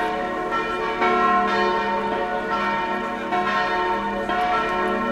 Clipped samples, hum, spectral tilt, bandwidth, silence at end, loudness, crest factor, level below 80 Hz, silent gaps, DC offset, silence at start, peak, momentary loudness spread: under 0.1%; none; -5 dB/octave; 14 kHz; 0 s; -22 LUFS; 16 dB; -48 dBFS; none; under 0.1%; 0 s; -6 dBFS; 6 LU